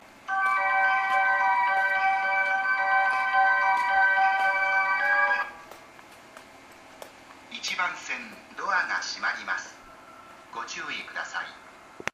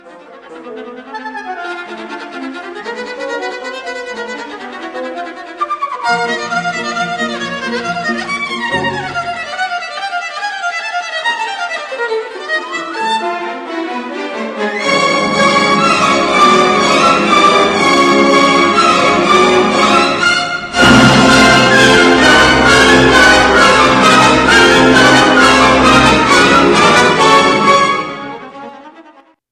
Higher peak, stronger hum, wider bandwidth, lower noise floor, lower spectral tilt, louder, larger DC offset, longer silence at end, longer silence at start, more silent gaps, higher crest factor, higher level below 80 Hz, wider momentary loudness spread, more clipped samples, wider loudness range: second, -6 dBFS vs 0 dBFS; neither; about the same, 14.5 kHz vs 15 kHz; first, -50 dBFS vs -44 dBFS; second, -0.5 dB/octave vs -3.5 dB/octave; second, -25 LUFS vs -10 LUFS; neither; second, 0.05 s vs 0.5 s; first, 0.25 s vs 0.05 s; neither; first, 20 dB vs 12 dB; second, -68 dBFS vs -36 dBFS; second, 14 LU vs 18 LU; second, under 0.1% vs 0.3%; second, 10 LU vs 16 LU